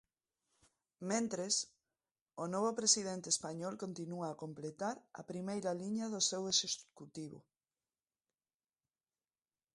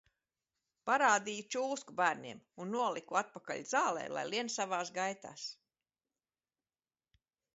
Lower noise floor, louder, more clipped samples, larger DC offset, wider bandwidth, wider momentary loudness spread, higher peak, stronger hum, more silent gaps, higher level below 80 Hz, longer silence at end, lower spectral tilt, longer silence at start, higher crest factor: about the same, under -90 dBFS vs under -90 dBFS; about the same, -37 LUFS vs -35 LUFS; neither; neither; first, 11.5 kHz vs 7.6 kHz; first, 17 LU vs 14 LU; about the same, -16 dBFS vs -16 dBFS; neither; first, 2.11-2.15 s, 2.21-2.26 s vs none; about the same, -82 dBFS vs -86 dBFS; first, 2.35 s vs 2 s; about the same, -2.5 dB/octave vs -1.5 dB/octave; first, 1 s vs 0.85 s; about the same, 24 dB vs 22 dB